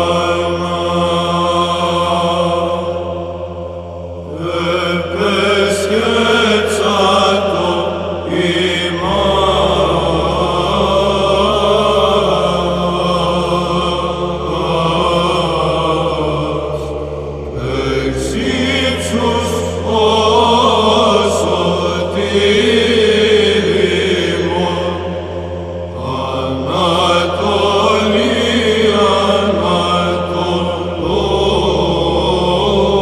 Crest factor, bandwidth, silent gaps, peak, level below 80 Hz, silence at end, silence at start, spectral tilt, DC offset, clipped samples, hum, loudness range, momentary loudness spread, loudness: 14 dB; 14 kHz; none; 0 dBFS; -32 dBFS; 0 s; 0 s; -5 dB/octave; 0.2%; under 0.1%; none; 5 LU; 9 LU; -14 LUFS